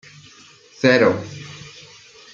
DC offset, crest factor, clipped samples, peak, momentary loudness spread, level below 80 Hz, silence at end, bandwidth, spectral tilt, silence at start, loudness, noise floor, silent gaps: under 0.1%; 20 dB; under 0.1%; -2 dBFS; 24 LU; -62 dBFS; 0.65 s; 7.6 kHz; -5.5 dB/octave; 0.8 s; -17 LUFS; -48 dBFS; none